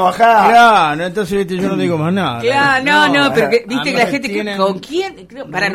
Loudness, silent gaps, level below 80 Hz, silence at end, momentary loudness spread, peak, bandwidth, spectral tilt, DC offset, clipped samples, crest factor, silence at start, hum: -13 LUFS; none; -48 dBFS; 0 s; 12 LU; 0 dBFS; 16 kHz; -5 dB/octave; under 0.1%; under 0.1%; 12 dB; 0 s; none